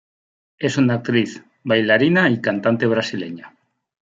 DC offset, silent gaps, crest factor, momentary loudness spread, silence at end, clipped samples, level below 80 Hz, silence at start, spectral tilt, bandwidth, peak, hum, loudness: under 0.1%; none; 18 dB; 14 LU; 0.65 s; under 0.1%; -64 dBFS; 0.6 s; -6 dB/octave; 7.8 kHz; -2 dBFS; none; -18 LUFS